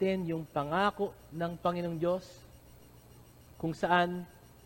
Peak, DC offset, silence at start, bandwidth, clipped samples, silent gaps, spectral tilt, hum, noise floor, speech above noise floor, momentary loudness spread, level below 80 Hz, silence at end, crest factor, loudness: -14 dBFS; under 0.1%; 0 s; 17 kHz; under 0.1%; none; -6.5 dB/octave; none; -56 dBFS; 24 dB; 11 LU; -60 dBFS; 0.3 s; 20 dB; -33 LUFS